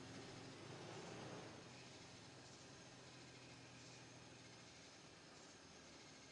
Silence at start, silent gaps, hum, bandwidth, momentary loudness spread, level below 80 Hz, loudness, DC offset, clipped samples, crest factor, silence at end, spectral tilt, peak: 0 s; none; none; 11 kHz; 6 LU; -84 dBFS; -58 LUFS; under 0.1%; under 0.1%; 16 dB; 0 s; -3.5 dB/octave; -42 dBFS